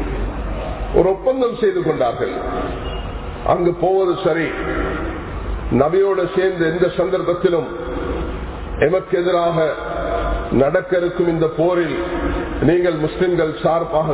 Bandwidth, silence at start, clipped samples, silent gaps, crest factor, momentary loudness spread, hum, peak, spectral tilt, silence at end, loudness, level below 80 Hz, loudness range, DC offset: 4 kHz; 0 s; under 0.1%; none; 16 dB; 9 LU; none; -2 dBFS; -11 dB/octave; 0 s; -19 LUFS; -30 dBFS; 2 LU; under 0.1%